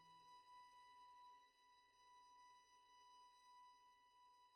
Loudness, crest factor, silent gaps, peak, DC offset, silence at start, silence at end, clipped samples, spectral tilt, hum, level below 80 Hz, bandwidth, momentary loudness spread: -68 LUFS; 12 dB; none; -58 dBFS; under 0.1%; 0 s; 0 s; under 0.1%; -1 dB/octave; none; under -90 dBFS; 10 kHz; 3 LU